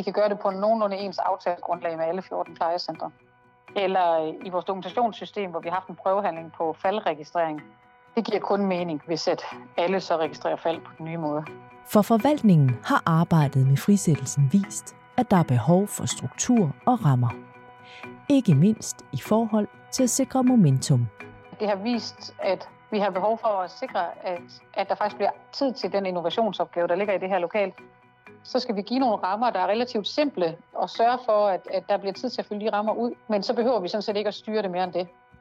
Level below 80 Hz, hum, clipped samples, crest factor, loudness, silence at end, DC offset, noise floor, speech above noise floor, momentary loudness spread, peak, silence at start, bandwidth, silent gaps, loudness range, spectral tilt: -64 dBFS; none; under 0.1%; 18 dB; -25 LUFS; 0.35 s; under 0.1%; -52 dBFS; 28 dB; 11 LU; -6 dBFS; 0 s; 15.5 kHz; none; 6 LU; -6 dB/octave